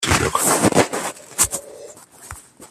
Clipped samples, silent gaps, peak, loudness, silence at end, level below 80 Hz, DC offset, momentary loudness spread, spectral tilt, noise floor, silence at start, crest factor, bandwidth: under 0.1%; none; 0 dBFS; -18 LUFS; 0.05 s; -42 dBFS; under 0.1%; 22 LU; -3 dB/octave; -41 dBFS; 0 s; 22 dB; 15 kHz